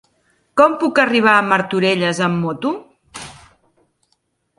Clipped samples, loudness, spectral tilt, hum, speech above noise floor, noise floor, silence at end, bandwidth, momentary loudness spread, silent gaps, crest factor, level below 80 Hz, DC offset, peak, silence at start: under 0.1%; -16 LUFS; -5 dB/octave; none; 52 dB; -67 dBFS; 1.25 s; 11.5 kHz; 21 LU; none; 18 dB; -60 dBFS; under 0.1%; 0 dBFS; 0.55 s